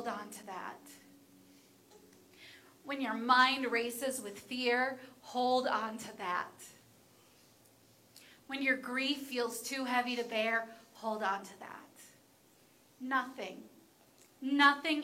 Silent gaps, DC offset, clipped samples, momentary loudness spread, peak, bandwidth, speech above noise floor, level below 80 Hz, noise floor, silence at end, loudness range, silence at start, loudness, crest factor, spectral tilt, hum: none; under 0.1%; under 0.1%; 23 LU; -12 dBFS; 16.5 kHz; 31 dB; -86 dBFS; -65 dBFS; 0 s; 8 LU; 0 s; -34 LUFS; 26 dB; -2 dB/octave; none